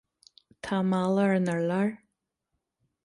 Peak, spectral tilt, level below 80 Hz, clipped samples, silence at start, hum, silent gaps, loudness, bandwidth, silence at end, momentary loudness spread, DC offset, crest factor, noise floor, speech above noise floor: -14 dBFS; -7.5 dB/octave; -68 dBFS; under 0.1%; 0.65 s; none; none; -27 LUFS; 11.5 kHz; 1.1 s; 7 LU; under 0.1%; 16 dB; -82 dBFS; 57 dB